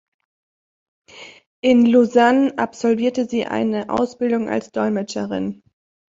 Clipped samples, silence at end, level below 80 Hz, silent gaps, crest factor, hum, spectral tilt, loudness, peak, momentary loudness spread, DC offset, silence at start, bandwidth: under 0.1%; 0.55 s; -60 dBFS; 1.46-1.62 s; 18 dB; none; -5.5 dB/octave; -19 LUFS; -2 dBFS; 11 LU; under 0.1%; 1.15 s; 7.8 kHz